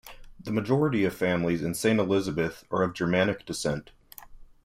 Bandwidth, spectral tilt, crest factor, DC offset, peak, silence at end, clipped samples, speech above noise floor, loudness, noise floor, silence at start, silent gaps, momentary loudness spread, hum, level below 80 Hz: 16 kHz; -5.5 dB/octave; 18 dB; under 0.1%; -10 dBFS; 0.2 s; under 0.1%; 21 dB; -27 LUFS; -47 dBFS; 0.05 s; none; 7 LU; none; -54 dBFS